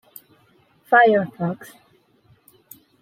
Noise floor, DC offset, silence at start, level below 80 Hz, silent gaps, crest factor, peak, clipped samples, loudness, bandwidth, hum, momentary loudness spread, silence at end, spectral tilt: -59 dBFS; under 0.1%; 0.9 s; -72 dBFS; none; 20 dB; -2 dBFS; under 0.1%; -18 LUFS; 16 kHz; none; 14 LU; 1.4 s; -6.5 dB/octave